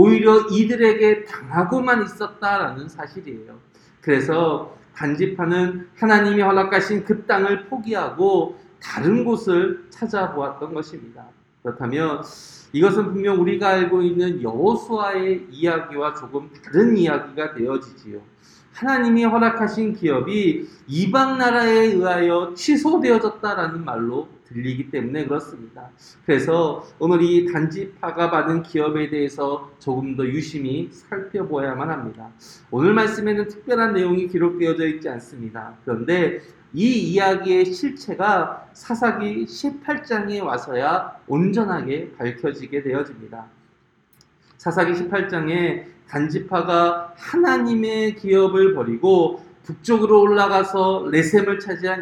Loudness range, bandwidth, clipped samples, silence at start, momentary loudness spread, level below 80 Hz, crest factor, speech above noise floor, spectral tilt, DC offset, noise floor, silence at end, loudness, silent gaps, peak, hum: 6 LU; 11.5 kHz; under 0.1%; 0 s; 14 LU; -62 dBFS; 20 dB; 39 dB; -6.5 dB/octave; under 0.1%; -59 dBFS; 0 s; -20 LUFS; none; 0 dBFS; none